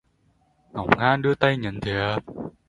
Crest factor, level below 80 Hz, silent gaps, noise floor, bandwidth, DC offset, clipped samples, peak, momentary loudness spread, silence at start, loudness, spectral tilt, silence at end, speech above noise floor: 24 dB; -50 dBFS; none; -64 dBFS; 11 kHz; under 0.1%; under 0.1%; 0 dBFS; 13 LU; 0.75 s; -23 LUFS; -7 dB/octave; 0.2 s; 41 dB